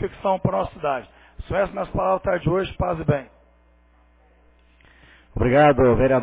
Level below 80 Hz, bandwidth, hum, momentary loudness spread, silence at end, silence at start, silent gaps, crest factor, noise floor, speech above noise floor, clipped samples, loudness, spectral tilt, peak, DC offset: -38 dBFS; 4 kHz; none; 11 LU; 0 s; 0 s; none; 18 dB; -56 dBFS; 36 dB; under 0.1%; -21 LUFS; -11 dB/octave; -4 dBFS; under 0.1%